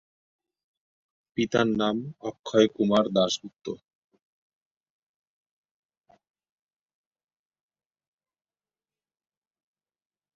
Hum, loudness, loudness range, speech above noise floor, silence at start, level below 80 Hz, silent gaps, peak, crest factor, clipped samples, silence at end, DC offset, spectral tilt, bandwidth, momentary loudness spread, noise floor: none; -25 LUFS; 11 LU; over 65 dB; 1.35 s; -68 dBFS; 2.39-2.44 s; -6 dBFS; 24 dB; under 0.1%; 6.6 s; under 0.1%; -5 dB/octave; 7.8 kHz; 16 LU; under -90 dBFS